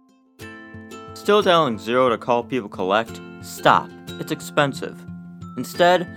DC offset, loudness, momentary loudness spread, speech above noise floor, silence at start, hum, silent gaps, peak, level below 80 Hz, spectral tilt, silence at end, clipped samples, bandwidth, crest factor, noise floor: under 0.1%; -20 LUFS; 21 LU; 23 dB; 0.4 s; none; none; 0 dBFS; -64 dBFS; -5 dB/octave; 0 s; under 0.1%; over 20 kHz; 20 dB; -43 dBFS